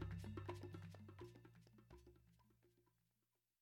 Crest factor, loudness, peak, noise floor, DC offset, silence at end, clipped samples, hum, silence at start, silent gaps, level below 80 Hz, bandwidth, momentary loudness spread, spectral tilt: 20 dB; -56 LUFS; -36 dBFS; under -90 dBFS; under 0.1%; 0.8 s; under 0.1%; none; 0 s; none; -68 dBFS; 18 kHz; 15 LU; -7 dB/octave